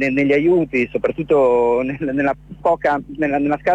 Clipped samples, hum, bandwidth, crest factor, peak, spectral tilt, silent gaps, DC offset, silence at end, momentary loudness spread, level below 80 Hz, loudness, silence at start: under 0.1%; none; 8.2 kHz; 12 dB; -6 dBFS; -8 dB/octave; none; under 0.1%; 0 s; 7 LU; -46 dBFS; -18 LUFS; 0 s